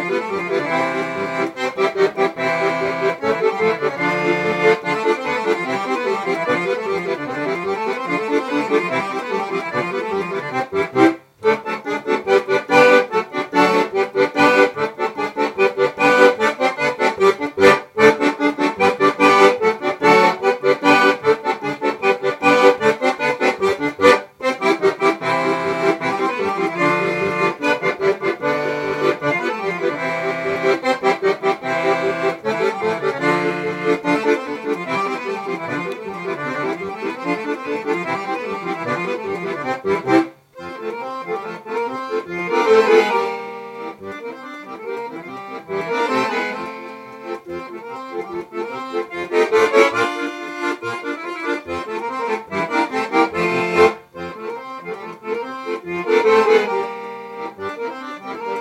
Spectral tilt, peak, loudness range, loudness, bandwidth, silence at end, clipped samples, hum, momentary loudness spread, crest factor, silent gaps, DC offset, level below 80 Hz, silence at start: -5 dB/octave; 0 dBFS; 8 LU; -18 LUFS; 16 kHz; 0 s; under 0.1%; none; 15 LU; 18 dB; none; under 0.1%; -62 dBFS; 0 s